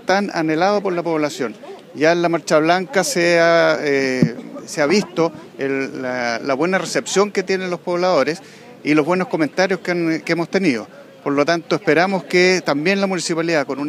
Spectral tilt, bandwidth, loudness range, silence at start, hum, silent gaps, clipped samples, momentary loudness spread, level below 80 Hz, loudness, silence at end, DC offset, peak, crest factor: -4.5 dB/octave; 15 kHz; 3 LU; 0.05 s; none; none; under 0.1%; 8 LU; -64 dBFS; -18 LUFS; 0 s; under 0.1%; -2 dBFS; 16 dB